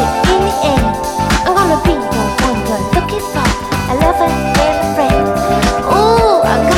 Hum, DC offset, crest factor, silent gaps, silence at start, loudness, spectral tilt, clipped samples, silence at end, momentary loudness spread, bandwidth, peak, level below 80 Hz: none; under 0.1%; 12 dB; none; 0 s; -13 LUFS; -5 dB/octave; under 0.1%; 0 s; 5 LU; 17.5 kHz; 0 dBFS; -24 dBFS